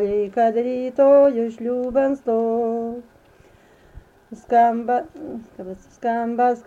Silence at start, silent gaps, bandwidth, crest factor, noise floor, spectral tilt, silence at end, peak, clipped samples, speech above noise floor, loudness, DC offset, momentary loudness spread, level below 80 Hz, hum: 0 s; none; 7.6 kHz; 14 dB; -52 dBFS; -7.5 dB/octave; 0.05 s; -6 dBFS; under 0.1%; 32 dB; -20 LUFS; under 0.1%; 20 LU; -56 dBFS; none